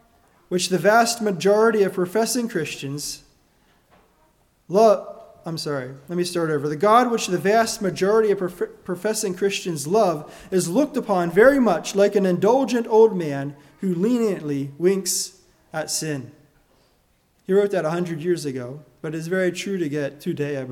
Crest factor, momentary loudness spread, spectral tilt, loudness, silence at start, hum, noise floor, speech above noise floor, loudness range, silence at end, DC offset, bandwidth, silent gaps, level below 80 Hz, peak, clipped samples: 20 dB; 13 LU; -4.5 dB/octave; -21 LUFS; 0.5 s; none; -63 dBFS; 42 dB; 7 LU; 0 s; under 0.1%; 17 kHz; none; -60 dBFS; -2 dBFS; under 0.1%